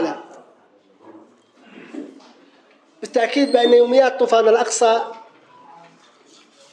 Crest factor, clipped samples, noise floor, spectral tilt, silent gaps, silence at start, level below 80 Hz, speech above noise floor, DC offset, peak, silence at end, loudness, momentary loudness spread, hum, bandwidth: 18 dB; under 0.1%; -54 dBFS; -2 dB/octave; none; 0 s; -88 dBFS; 39 dB; under 0.1%; -2 dBFS; 1.55 s; -16 LUFS; 23 LU; none; 10.5 kHz